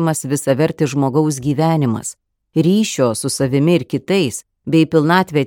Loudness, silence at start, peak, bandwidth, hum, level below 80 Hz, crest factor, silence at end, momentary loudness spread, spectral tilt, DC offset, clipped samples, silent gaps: -16 LUFS; 0 s; 0 dBFS; 17.5 kHz; none; -54 dBFS; 16 dB; 0 s; 6 LU; -5.5 dB/octave; under 0.1%; under 0.1%; none